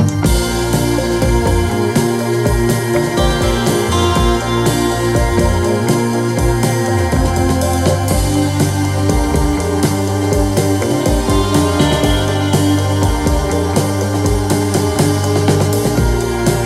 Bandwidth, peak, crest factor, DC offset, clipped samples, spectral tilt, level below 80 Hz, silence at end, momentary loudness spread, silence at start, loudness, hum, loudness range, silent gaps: 16 kHz; -2 dBFS; 12 dB; under 0.1%; under 0.1%; -5.5 dB/octave; -22 dBFS; 0 s; 2 LU; 0 s; -14 LUFS; none; 1 LU; none